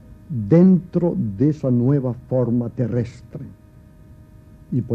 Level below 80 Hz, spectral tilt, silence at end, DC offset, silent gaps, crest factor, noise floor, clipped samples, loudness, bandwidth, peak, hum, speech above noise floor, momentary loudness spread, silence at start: -48 dBFS; -11 dB/octave; 0 s; under 0.1%; none; 18 dB; -45 dBFS; under 0.1%; -20 LUFS; 6.2 kHz; -2 dBFS; none; 27 dB; 19 LU; 0.1 s